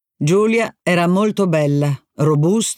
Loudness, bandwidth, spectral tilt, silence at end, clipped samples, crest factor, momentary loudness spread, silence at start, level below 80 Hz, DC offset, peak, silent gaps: -17 LUFS; 15.5 kHz; -6 dB/octave; 0.05 s; under 0.1%; 12 dB; 4 LU; 0.2 s; -64 dBFS; under 0.1%; -4 dBFS; none